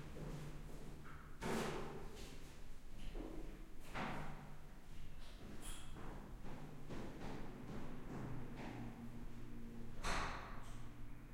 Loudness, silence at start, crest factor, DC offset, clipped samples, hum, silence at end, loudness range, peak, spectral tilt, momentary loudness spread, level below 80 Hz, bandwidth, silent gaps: -51 LUFS; 0 s; 20 dB; under 0.1%; under 0.1%; none; 0 s; 4 LU; -28 dBFS; -5 dB/octave; 13 LU; -52 dBFS; 16 kHz; none